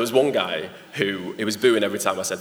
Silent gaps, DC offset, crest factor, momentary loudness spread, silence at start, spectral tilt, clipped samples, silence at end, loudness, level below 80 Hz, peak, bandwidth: none; under 0.1%; 20 dB; 8 LU; 0 s; -3.5 dB/octave; under 0.1%; 0 s; -23 LUFS; -74 dBFS; -4 dBFS; over 20 kHz